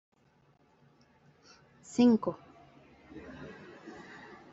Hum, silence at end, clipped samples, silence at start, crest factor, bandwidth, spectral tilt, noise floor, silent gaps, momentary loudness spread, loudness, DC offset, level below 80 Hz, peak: none; 0.65 s; under 0.1%; 1.95 s; 20 dB; 8 kHz; -6 dB/octave; -67 dBFS; none; 25 LU; -28 LUFS; under 0.1%; -70 dBFS; -16 dBFS